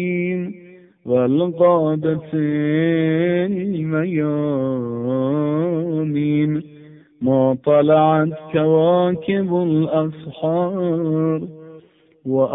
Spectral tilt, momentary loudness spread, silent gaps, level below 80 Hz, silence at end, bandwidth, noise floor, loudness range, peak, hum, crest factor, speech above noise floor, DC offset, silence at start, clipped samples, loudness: -13 dB/octave; 8 LU; none; -60 dBFS; 0 s; 3.9 kHz; -48 dBFS; 4 LU; -4 dBFS; none; 14 dB; 30 dB; under 0.1%; 0 s; under 0.1%; -19 LUFS